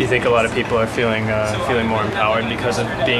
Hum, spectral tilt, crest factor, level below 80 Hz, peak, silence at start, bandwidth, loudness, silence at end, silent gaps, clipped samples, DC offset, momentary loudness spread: none; -5 dB/octave; 16 dB; -38 dBFS; -2 dBFS; 0 s; 13 kHz; -18 LUFS; 0 s; none; under 0.1%; under 0.1%; 4 LU